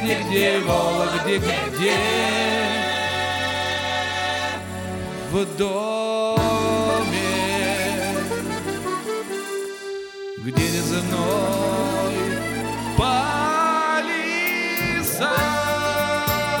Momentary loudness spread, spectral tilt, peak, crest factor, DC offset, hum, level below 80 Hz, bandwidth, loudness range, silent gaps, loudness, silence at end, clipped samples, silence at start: 8 LU; -4 dB/octave; -4 dBFS; 18 dB; under 0.1%; none; -44 dBFS; over 20 kHz; 4 LU; none; -22 LUFS; 0 s; under 0.1%; 0 s